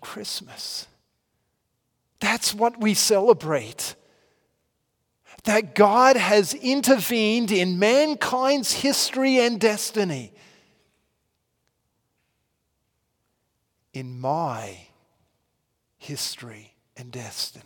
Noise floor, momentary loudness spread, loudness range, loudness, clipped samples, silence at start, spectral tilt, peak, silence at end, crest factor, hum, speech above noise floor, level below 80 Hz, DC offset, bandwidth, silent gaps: -75 dBFS; 17 LU; 15 LU; -21 LUFS; under 0.1%; 0 s; -3.5 dB/octave; -4 dBFS; 0.05 s; 22 dB; none; 53 dB; -70 dBFS; under 0.1%; 18 kHz; none